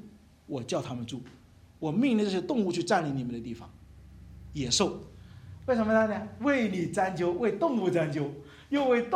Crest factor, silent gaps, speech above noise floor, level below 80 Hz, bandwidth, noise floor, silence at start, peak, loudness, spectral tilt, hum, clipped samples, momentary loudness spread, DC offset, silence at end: 18 dB; none; 23 dB; -56 dBFS; 13 kHz; -52 dBFS; 0.05 s; -12 dBFS; -29 LUFS; -5 dB/octave; none; under 0.1%; 16 LU; under 0.1%; 0 s